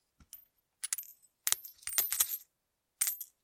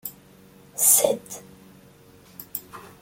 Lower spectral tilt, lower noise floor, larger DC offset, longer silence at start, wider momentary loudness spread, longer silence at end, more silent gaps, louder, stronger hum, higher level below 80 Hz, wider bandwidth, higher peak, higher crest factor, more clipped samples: second, 3 dB/octave vs -1 dB/octave; first, -83 dBFS vs -51 dBFS; neither; first, 0.2 s vs 0.05 s; about the same, 23 LU vs 25 LU; about the same, 0.2 s vs 0.15 s; neither; second, -33 LUFS vs -18 LUFS; neither; second, -76 dBFS vs -66 dBFS; about the same, 17 kHz vs 17 kHz; about the same, -2 dBFS vs -2 dBFS; first, 36 dB vs 24 dB; neither